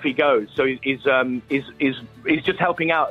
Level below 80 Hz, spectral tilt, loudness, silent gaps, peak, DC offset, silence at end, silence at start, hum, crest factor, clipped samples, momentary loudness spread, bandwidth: -56 dBFS; -7 dB/octave; -21 LUFS; none; -4 dBFS; under 0.1%; 0 s; 0 s; none; 16 dB; under 0.1%; 5 LU; 6.6 kHz